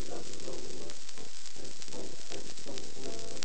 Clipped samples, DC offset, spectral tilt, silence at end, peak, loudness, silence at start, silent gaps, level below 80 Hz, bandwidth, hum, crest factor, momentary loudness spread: under 0.1%; 6%; -3 dB/octave; 0 s; -12 dBFS; -43 LUFS; 0 s; none; -62 dBFS; 9.2 kHz; none; 30 dB; 3 LU